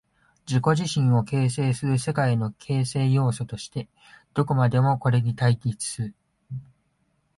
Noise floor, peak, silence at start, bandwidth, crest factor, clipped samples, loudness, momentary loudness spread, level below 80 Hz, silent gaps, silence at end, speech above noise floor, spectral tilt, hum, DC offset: -70 dBFS; -8 dBFS; 0.5 s; 11.5 kHz; 16 dB; under 0.1%; -24 LUFS; 13 LU; -56 dBFS; none; 0.75 s; 47 dB; -6.5 dB/octave; none; under 0.1%